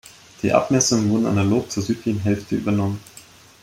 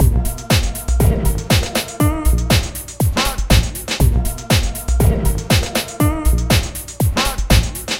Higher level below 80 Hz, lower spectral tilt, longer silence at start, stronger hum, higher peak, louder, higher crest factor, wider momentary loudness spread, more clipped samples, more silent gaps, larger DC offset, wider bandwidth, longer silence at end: second, -54 dBFS vs -20 dBFS; about the same, -5 dB/octave vs -4.5 dB/octave; first, 0.45 s vs 0 s; neither; about the same, -2 dBFS vs 0 dBFS; second, -20 LUFS vs -17 LUFS; about the same, 18 dB vs 16 dB; first, 8 LU vs 5 LU; neither; neither; second, under 0.1% vs 0.1%; about the same, 16 kHz vs 17 kHz; first, 0.4 s vs 0 s